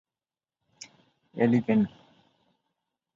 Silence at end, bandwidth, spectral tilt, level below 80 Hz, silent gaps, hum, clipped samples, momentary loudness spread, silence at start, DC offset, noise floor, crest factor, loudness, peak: 1.3 s; 7.6 kHz; -7.5 dB/octave; -68 dBFS; none; none; under 0.1%; 24 LU; 1.35 s; under 0.1%; under -90 dBFS; 20 dB; -26 LUFS; -10 dBFS